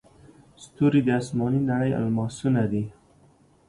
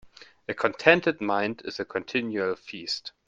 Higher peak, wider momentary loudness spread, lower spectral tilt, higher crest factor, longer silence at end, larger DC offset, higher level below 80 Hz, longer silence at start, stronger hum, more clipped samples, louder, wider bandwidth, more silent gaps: second, -10 dBFS vs -2 dBFS; second, 6 LU vs 14 LU; first, -7.5 dB/octave vs -5 dB/octave; second, 16 dB vs 26 dB; first, 0.8 s vs 0.2 s; neither; first, -56 dBFS vs -68 dBFS; first, 0.6 s vs 0.05 s; neither; neither; about the same, -24 LUFS vs -26 LUFS; first, 11.5 kHz vs 9.2 kHz; neither